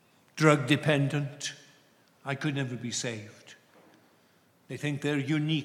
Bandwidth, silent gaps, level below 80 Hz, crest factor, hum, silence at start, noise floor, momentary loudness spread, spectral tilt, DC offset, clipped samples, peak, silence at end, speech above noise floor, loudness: 13 kHz; none; -80 dBFS; 24 dB; none; 0.35 s; -64 dBFS; 19 LU; -5 dB/octave; under 0.1%; under 0.1%; -8 dBFS; 0 s; 36 dB; -29 LUFS